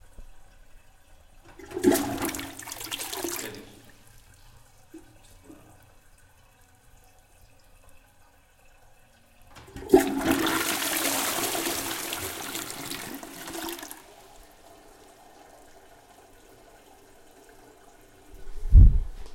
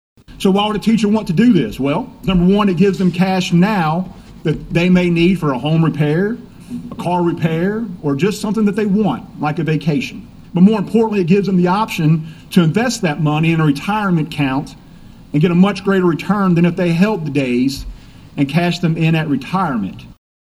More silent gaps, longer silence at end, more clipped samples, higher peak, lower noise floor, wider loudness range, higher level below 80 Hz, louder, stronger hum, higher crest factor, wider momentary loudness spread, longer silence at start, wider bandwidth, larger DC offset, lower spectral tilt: neither; second, 0 s vs 0.35 s; neither; second, -4 dBFS vs 0 dBFS; first, -57 dBFS vs -39 dBFS; first, 16 LU vs 3 LU; first, -32 dBFS vs -40 dBFS; second, -26 LUFS vs -16 LUFS; neither; first, 24 dB vs 16 dB; first, 24 LU vs 9 LU; about the same, 0.2 s vs 0.3 s; first, 17 kHz vs 14 kHz; neither; second, -4.5 dB/octave vs -7 dB/octave